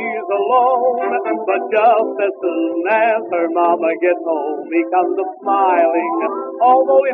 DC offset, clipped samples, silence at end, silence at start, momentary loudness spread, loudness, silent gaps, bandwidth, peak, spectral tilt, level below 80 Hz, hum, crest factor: under 0.1%; under 0.1%; 0 s; 0 s; 7 LU; -16 LUFS; none; 3.8 kHz; -2 dBFS; -2 dB/octave; -86 dBFS; none; 14 dB